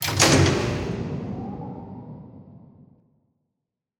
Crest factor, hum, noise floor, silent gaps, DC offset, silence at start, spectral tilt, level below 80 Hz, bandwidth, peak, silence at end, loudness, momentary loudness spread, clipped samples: 24 dB; none; -83 dBFS; none; under 0.1%; 0 s; -4 dB/octave; -44 dBFS; 19 kHz; -2 dBFS; 1.4 s; -22 LUFS; 25 LU; under 0.1%